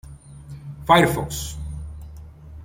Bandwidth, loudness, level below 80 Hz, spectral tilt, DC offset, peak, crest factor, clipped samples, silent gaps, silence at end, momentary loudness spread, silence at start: 16.5 kHz; -20 LUFS; -40 dBFS; -5 dB/octave; under 0.1%; -2 dBFS; 22 dB; under 0.1%; none; 0 s; 26 LU; 0.05 s